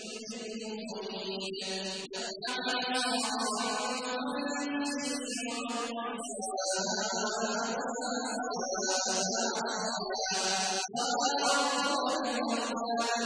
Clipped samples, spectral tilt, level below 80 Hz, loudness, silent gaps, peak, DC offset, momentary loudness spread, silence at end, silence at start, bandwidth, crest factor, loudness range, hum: under 0.1%; -1.5 dB/octave; -76 dBFS; -32 LUFS; none; -16 dBFS; under 0.1%; 8 LU; 0 s; 0 s; 10.5 kHz; 16 dB; 4 LU; none